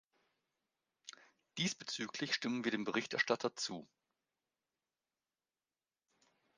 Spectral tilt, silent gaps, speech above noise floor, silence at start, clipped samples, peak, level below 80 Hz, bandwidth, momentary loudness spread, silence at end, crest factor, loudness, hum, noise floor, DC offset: -3 dB/octave; none; over 51 dB; 1.05 s; under 0.1%; -18 dBFS; -86 dBFS; 10 kHz; 20 LU; 2.75 s; 26 dB; -38 LUFS; none; under -90 dBFS; under 0.1%